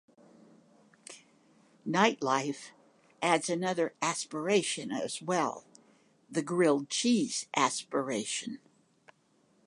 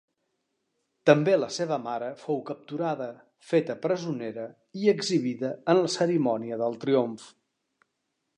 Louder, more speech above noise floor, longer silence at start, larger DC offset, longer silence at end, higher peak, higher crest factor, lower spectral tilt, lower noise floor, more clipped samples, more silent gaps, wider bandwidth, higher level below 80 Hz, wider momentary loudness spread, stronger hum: second, -31 LUFS vs -27 LUFS; second, 39 dB vs 53 dB; about the same, 1.1 s vs 1.05 s; neither; about the same, 1.1 s vs 1.1 s; second, -8 dBFS vs -4 dBFS; about the same, 24 dB vs 24 dB; second, -3.5 dB/octave vs -5.5 dB/octave; second, -69 dBFS vs -80 dBFS; neither; neither; about the same, 11.5 kHz vs 10.5 kHz; about the same, -82 dBFS vs -80 dBFS; first, 17 LU vs 12 LU; neither